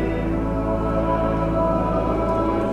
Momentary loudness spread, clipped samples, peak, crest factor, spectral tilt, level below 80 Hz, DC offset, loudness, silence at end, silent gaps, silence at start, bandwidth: 3 LU; under 0.1%; -8 dBFS; 12 dB; -9 dB/octave; -30 dBFS; under 0.1%; -22 LUFS; 0 s; none; 0 s; 9 kHz